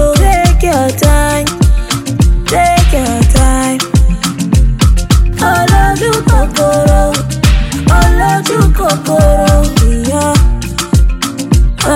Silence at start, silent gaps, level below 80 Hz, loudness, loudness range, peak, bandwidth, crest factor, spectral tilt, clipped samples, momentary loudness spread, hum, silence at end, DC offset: 0 s; none; -12 dBFS; -10 LUFS; 1 LU; 0 dBFS; 16.5 kHz; 8 dB; -5 dB/octave; 0.4%; 4 LU; none; 0 s; under 0.1%